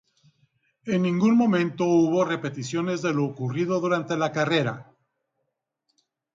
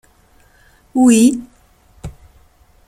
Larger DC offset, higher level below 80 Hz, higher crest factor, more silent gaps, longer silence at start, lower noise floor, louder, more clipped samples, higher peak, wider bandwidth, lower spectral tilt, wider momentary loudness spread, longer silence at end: neither; second, -68 dBFS vs -46 dBFS; about the same, 14 dB vs 16 dB; neither; about the same, 0.85 s vs 0.95 s; first, -80 dBFS vs -51 dBFS; second, -24 LUFS vs -13 LUFS; neither; second, -10 dBFS vs -2 dBFS; second, 7.6 kHz vs 13 kHz; first, -6.5 dB/octave vs -4.5 dB/octave; second, 9 LU vs 26 LU; first, 1.55 s vs 0.8 s